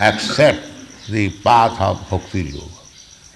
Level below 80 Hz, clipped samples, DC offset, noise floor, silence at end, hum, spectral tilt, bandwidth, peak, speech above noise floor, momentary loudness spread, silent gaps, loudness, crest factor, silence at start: -42 dBFS; under 0.1%; under 0.1%; -43 dBFS; 0.6 s; none; -5 dB/octave; 12 kHz; -2 dBFS; 27 dB; 21 LU; none; -17 LUFS; 16 dB; 0 s